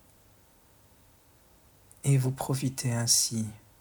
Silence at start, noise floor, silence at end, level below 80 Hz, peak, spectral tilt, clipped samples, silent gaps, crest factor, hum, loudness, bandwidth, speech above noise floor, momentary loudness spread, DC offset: 2.05 s; -60 dBFS; 0.25 s; -62 dBFS; -8 dBFS; -4 dB/octave; under 0.1%; none; 24 dB; none; -27 LUFS; over 20 kHz; 33 dB; 11 LU; under 0.1%